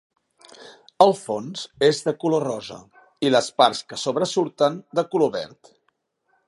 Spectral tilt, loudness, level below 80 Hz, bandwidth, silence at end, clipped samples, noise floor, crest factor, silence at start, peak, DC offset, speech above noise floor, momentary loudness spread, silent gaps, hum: -4.5 dB/octave; -22 LUFS; -70 dBFS; 11.5 kHz; 1 s; under 0.1%; -71 dBFS; 22 dB; 0.6 s; 0 dBFS; under 0.1%; 49 dB; 14 LU; none; none